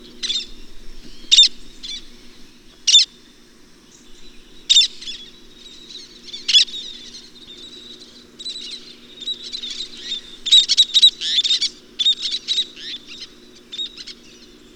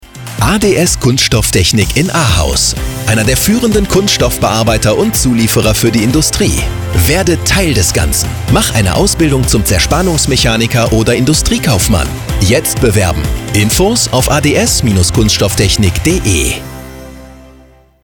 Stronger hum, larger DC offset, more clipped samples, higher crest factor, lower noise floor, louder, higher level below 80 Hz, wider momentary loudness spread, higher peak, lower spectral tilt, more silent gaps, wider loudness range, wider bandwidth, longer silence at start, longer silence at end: neither; neither; neither; first, 20 dB vs 10 dB; first, -47 dBFS vs -41 dBFS; second, -15 LUFS vs -10 LUFS; second, -48 dBFS vs -22 dBFS; first, 25 LU vs 4 LU; about the same, 0 dBFS vs 0 dBFS; second, 2 dB/octave vs -4 dB/octave; neither; first, 7 LU vs 1 LU; about the same, 19 kHz vs 19.5 kHz; about the same, 0.05 s vs 0.05 s; about the same, 0.65 s vs 0.7 s